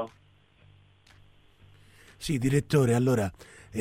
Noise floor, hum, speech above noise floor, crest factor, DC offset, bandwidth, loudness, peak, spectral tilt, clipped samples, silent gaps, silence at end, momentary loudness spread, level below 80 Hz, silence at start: -61 dBFS; none; 35 dB; 20 dB; under 0.1%; 16 kHz; -27 LUFS; -10 dBFS; -6.5 dB/octave; under 0.1%; none; 0 s; 15 LU; -52 dBFS; 0 s